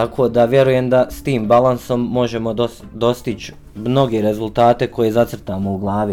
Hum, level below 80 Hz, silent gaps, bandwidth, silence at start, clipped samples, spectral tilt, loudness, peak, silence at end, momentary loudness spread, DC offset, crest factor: none; -42 dBFS; none; 17 kHz; 0 s; under 0.1%; -7 dB/octave; -17 LUFS; -2 dBFS; 0 s; 10 LU; under 0.1%; 14 dB